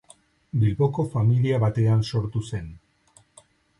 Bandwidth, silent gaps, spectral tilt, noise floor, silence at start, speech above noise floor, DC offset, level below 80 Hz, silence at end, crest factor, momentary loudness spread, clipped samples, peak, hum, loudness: 11 kHz; none; -8 dB/octave; -59 dBFS; 0.55 s; 37 dB; under 0.1%; -48 dBFS; 1.05 s; 14 dB; 11 LU; under 0.1%; -10 dBFS; none; -24 LUFS